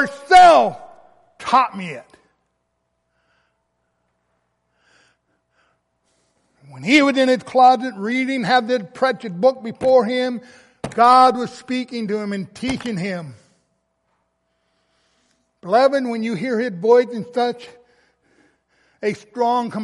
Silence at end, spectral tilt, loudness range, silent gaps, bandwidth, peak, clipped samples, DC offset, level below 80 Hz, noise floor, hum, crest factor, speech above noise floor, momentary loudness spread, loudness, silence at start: 0 s; -5 dB/octave; 10 LU; none; 11.5 kHz; -2 dBFS; under 0.1%; under 0.1%; -58 dBFS; -72 dBFS; none; 18 dB; 55 dB; 17 LU; -17 LUFS; 0 s